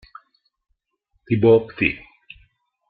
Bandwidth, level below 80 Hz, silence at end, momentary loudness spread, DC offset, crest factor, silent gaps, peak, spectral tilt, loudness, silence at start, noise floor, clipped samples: 4.7 kHz; -52 dBFS; 0.95 s; 10 LU; under 0.1%; 20 dB; none; -2 dBFS; -11 dB/octave; -18 LUFS; 1.3 s; -70 dBFS; under 0.1%